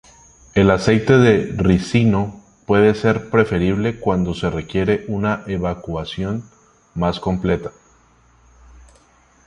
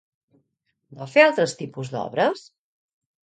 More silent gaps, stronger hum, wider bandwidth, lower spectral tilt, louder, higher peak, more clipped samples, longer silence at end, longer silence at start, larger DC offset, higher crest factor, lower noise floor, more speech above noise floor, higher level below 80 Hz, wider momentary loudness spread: neither; neither; first, 10.5 kHz vs 9.4 kHz; first, -7 dB/octave vs -4.5 dB/octave; first, -18 LUFS vs -21 LUFS; about the same, -2 dBFS vs -2 dBFS; neither; first, 1.75 s vs 0.85 s; second, 0.55 s vs 0.9 s; neither; second, 18 dB vs 24 dB; second, -54 dBFS vs -74 dBFS; second, 36 dB vs 53 dB; first, -38 dBFS vs -72 dBFS; second, 11 LU vs 17 LU